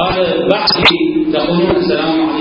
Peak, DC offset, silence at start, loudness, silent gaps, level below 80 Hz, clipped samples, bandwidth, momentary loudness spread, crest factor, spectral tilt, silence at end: 0 dBFS; under 0.1%; 0 s; -12 LUFS; none; -38 dBFS; 0.1%; 8 kHz; 5 LU; 12 dB; -6.5 dB/octave; 0 s